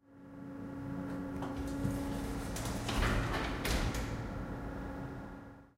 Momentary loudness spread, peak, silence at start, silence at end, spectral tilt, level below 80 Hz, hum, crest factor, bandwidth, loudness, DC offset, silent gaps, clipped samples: 13 LU; -20 dBFS; 0.1 s; 0.1 s; -5 dB/octave; -44 dBFS; none; 18 dB; 16 kHz; -38 LUFS; under 0.1%; none; under 0.1%